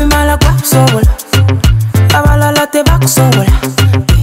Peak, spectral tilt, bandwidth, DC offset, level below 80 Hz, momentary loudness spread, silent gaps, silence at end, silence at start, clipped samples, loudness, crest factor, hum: 0 dBFS; -5 dB/octave; 16.5 kHz; under 0.1%; -14 dBFS; 3 LU; none; 0 s; 0 s; under 0.1%; -9 LUFS; 8 dB; none